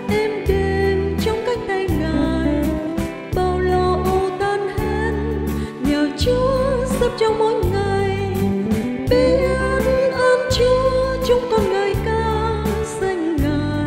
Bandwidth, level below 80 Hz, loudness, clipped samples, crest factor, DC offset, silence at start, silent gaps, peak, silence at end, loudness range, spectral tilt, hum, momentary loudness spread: 16 kHz; -30 dBFS; -19 LUFS; under 0.1%; 14 dB; under 0.1%; 0 s; none; -4 dBFS; 0 s; 3 LU; -6 dB/octave; none; 6 LU